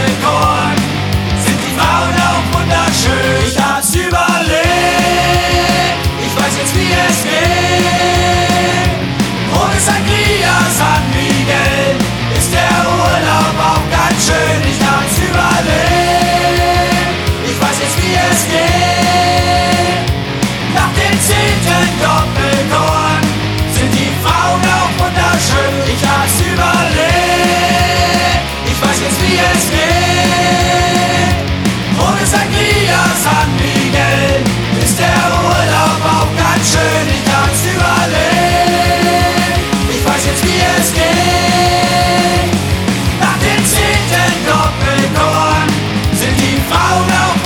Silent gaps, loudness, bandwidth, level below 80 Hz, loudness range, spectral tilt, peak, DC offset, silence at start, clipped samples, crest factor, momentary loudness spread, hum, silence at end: none; -11 LUFS; 19 kHz; -24 dBFS; 1 LU; -4 dB/octave; 0 dBFS; under 0.1%; 0 s; under 0.1%; 12 dB; 3 LU; none; 0 s